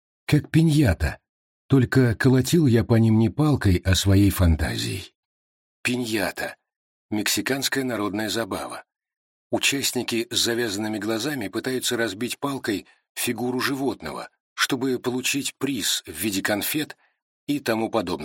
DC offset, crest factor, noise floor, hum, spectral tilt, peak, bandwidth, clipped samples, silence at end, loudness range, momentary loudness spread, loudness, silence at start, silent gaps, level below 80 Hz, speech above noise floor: under 0.1%; 18 dB; under -90 dBFS; none; -5 dB/octave; -6 dBFS; 17 kHz; under 0.1%; 0 s; 7 LU; 11 LU; -23 LUFS; 0.3 s; 1.29-1.69 s, 5.15-5.84 s, 6.76-7.09 s, 9.17-9.50 s, 13.09-13.15 s, 14.40-14.56 s, 17.22-17.47 s; -40 dBFS; over 68 dB